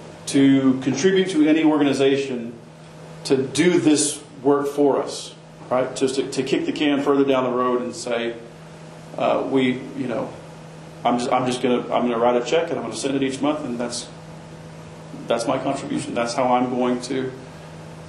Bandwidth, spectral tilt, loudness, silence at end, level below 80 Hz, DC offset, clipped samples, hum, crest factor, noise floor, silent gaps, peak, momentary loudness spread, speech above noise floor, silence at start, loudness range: 12 kHz; -4.5 dB/octave; -21 LUFS; 0 s; -60 dBFS; under 0.1%; under 0.1%; none; 16 dB; -40 dBFS; none; -4 dBFS; 21 LU; 20 dB; 0 s; 6 LU